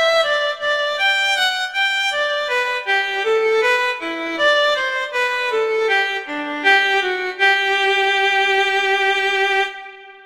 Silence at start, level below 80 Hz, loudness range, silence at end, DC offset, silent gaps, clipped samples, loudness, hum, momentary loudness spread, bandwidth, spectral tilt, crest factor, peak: 0 s; -64 dBFS; 2 LU; 0.05 s; under 0.1%; none; under 0.1%; -17 LUFS; none; 6 LU; 16 kHz; -0.5 dB/octave; 14 dB; -4 dBFS